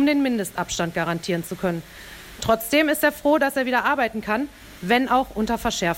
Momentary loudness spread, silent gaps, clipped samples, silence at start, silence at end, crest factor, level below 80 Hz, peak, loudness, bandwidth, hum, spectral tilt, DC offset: 12 LU; none; under 0.1%; 0 s; 0 s; 16 dB; -48 dBFS; -6 dBFS; -22 LUFS; 16.5 kHz; none; -4.5 dB/octave; under 0.1%